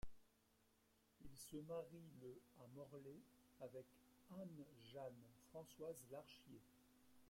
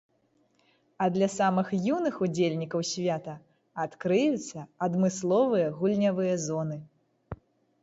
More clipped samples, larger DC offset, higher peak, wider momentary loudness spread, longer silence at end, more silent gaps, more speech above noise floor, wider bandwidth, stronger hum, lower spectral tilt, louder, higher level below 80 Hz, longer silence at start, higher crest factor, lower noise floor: neither; neither; second, -40 dBFS vs -12 dBFS; second, 12 LU vs 17 LU; second, 0 s vs 0.5 s; neither; second, 22 dB vs 42 dB; first, 16.5 kHz vs 8 kHz; neither; about the same, -5.5 dB/octave vs -6 dB/octave; second, -59 LUFS vs -28 LUFS; second, -74 dBFS vs -64 dBFS; second, 0 s vs 1 s; about the same, 18 dB vs 16 dB; first, -80 dBFS vs -69 dBFS